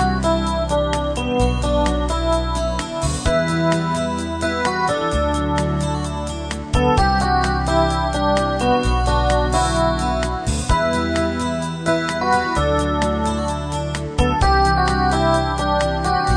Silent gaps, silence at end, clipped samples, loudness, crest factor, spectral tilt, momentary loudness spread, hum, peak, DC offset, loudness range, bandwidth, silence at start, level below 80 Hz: none; 0 s; under 0.1%; -19 LUFS; 16 dB; -5.5 dB/octave; 6 LU; none; -2 dBFS; 0.2%; 2 LU; 10 kHz; 0 s; -26 dBFS